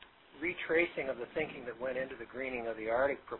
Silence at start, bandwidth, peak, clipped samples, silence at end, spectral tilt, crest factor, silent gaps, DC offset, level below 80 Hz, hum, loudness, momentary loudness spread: 0 s; 4 kHz; -16 dBFS; under 0.1%; 0 s; -3 dB/octave; 20 dB; none; under 0.1%; -64 dBFS; none; -36 LUFS; 9 LU